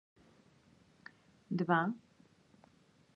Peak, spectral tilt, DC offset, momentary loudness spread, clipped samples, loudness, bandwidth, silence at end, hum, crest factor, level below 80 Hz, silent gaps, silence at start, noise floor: -16 dBFS; -8.5 dB/octave; under 0.1%; 25 LU; under 0.1%; -35 LUFS; 7 kHz; 1.2 s; none; 24 dB; -80 dBFS; none; 1.5 s; -68 dBFS